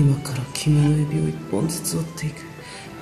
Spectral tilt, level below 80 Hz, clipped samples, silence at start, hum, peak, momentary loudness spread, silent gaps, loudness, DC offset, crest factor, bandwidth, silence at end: -6 dB/octave; -46 dBFS; under 0.1%; 0 s; none; -4 dBFS; 18 LU; none; -23 LUFS; under 0.1%; 18 dB; 13.5 kHz; 0 s